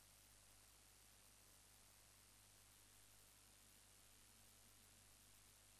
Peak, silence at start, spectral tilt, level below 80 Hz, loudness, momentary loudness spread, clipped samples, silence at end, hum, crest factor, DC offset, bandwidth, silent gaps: -54 dBFS; 0 s; -1.5 dB/octave; -80 dBFS; -68 LUFS; 0 LU; under 0.1%; 0 s; 50 Hz at -80 dBFS; 14 dB; under 0.1%; 15 kHz; none